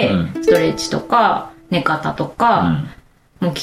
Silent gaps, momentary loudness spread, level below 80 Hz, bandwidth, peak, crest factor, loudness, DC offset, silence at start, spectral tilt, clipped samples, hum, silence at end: none; 9 LU; -46 dBFS; 15.5 kHz; -2 dBFS; 16 dB; -17 LUFS; under 0.1%; 0 s; -5.5 dB/octave; under 0.1%; none; 0 s